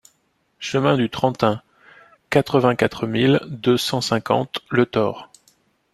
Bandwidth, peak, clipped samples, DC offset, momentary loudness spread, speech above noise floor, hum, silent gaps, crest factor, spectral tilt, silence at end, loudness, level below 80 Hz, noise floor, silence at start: 14 kHz; -2 dBFS; under 0.1%; under 0.1%; 6 LU; 47 dB; none; none; 20 dB; -5.5 dB/octave; 0.7 s; -20 LUFS; -56 dBFS; -66 dBFS; 0.6 s